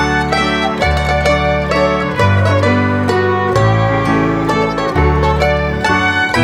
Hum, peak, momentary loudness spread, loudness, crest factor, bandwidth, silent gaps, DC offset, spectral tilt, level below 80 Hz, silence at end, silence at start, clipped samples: none; 0 dBFS; 2 LU; -13 LUFS; 12 dB; 12.5 kHz; none; under 0.1%; -6 dB/octave; -24 dBFS; 0 s; 0 s; under 0.1%